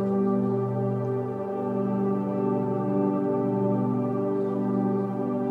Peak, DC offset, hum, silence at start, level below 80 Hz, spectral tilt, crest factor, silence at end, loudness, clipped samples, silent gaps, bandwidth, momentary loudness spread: -14 dBFS; under 0.1%; none; 0 s; -76 dBFS; -11.5 dB/octave; 12 dB; 0 s; -26 LUFS; under 0.1%; none; 4.1 kHz; 3 LU